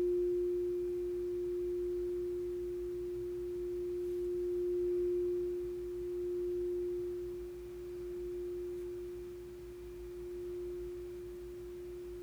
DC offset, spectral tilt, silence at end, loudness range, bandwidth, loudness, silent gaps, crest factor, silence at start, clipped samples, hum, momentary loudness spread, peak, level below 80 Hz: under 0.1%; -7.5 dB/octave; 0 s; 7 LU; over 20 kHz; -39 LUFS; none; 10 dB; 0 s; under 0.1%; none; 12 LU; -28 dBFS; -56 dBFS